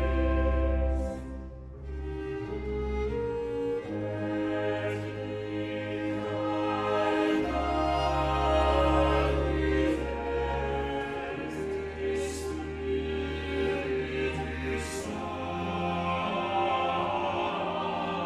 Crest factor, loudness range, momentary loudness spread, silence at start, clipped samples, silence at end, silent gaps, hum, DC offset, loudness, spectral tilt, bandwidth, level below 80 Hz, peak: 16 dB; 6 LU; 9 LU; 0 s; under 0.1%; 0 s; none; none; under 0.1%; -30 LUFS; -6.5 dB/octave; 12.5 kHz; -36 dBFS; -12 dBFS